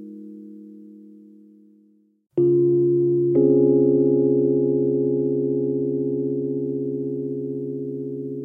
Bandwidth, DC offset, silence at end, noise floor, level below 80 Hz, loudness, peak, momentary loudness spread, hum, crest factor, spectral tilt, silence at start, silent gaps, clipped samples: 1.3 kHz; under 0.1%; 0 s; -58 dBFS; -70 dBFS; -21 LUFS; -6 dBFS; 13 LU; none; 16 dB; -14.5 dB/octave; 0 s; none; under 0.1%